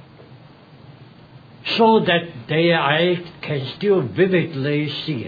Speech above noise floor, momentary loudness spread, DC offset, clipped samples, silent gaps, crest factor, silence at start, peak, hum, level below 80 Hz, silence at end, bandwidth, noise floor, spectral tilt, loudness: 26 dB; 11 LU; under 0.1%; under 0.1%; none; 18 dB; 0.2 s; -4 dBFS; none; -62 dBFS; 0 s; 5 kHz; -45 dBFS; -8 dB/octave; -19 LUFS